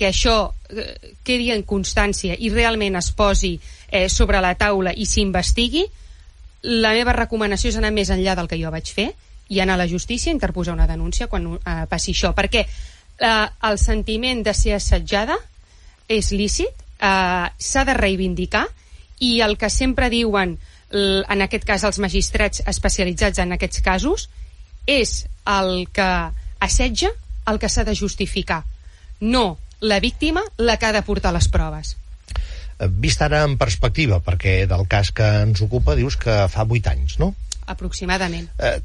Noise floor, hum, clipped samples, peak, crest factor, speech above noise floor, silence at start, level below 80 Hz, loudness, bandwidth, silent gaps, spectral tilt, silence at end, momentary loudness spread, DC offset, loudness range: -46 dBFS; none; under 0.1%; -2 dBFS; 18 dB; 28 dB; 0 s; -26 dBFS; -20 LUFS; 11.5 kHz; none; -4 dB/octave; 0 s; 9 LU; under 0.1%; 3 LU